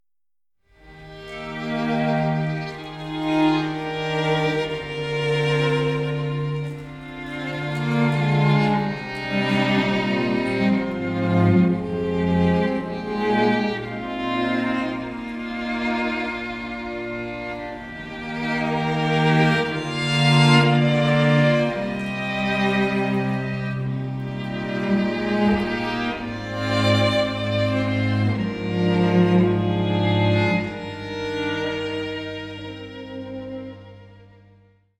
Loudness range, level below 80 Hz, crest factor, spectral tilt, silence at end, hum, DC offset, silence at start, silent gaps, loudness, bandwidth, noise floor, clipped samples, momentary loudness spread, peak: 8 LU; -48 dBFS; 20 dB; -7 dB/octave; 0.75 s; none; under 0.1%; 0.85 s; none; -22 LUFS; 11 kHz; under -90 dBFS; under 0.1%; 14 LU; -4 dBFS